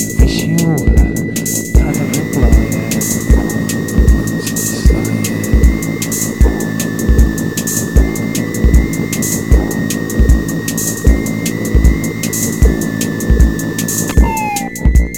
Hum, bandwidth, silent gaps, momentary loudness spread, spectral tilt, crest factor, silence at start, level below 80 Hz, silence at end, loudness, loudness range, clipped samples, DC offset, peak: none; 17.5 kHz; none; 4 LU; -5 dB/octave; 12 dB; 0 s; -14 dBFS; 0 s; -14 LUFS; 1 LU; under 0.1%; 0.8%; 0 dBFS